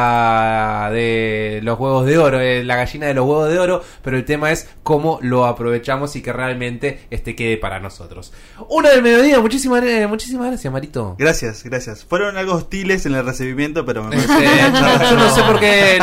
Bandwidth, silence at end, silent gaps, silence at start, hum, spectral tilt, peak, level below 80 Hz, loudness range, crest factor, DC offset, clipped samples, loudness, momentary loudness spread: 16 kHz; 0 s; none; 0 s; none; -5 dB/octave; -4 dBFS; -36 dBFS; 6 LU; 12 dB; under 0.1%; under 0.1%; -15 LUFS; 13 LU